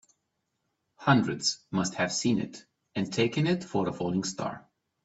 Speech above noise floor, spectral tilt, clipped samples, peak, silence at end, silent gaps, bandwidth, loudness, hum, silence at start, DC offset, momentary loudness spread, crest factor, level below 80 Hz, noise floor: 52 dB; -4.5 dB/octave; under 0.1%; -8 dBFS; 0.45 s; none; 8.4 kHz; -29 LUFS; none; 1 s; under 0.1%; 12 LU; 22 dB; -66 dBFS; -80 dBFS